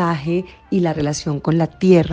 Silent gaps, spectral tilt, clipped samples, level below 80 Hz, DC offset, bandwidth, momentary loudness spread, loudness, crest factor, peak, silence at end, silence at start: none; -7 dB/octave; under 0.1%; -46 dBFS; under 0.1%; 9.2 kHz; 9 LU; -19 LUFS; 16 dB; -2 dBFS; 0 s; 0 s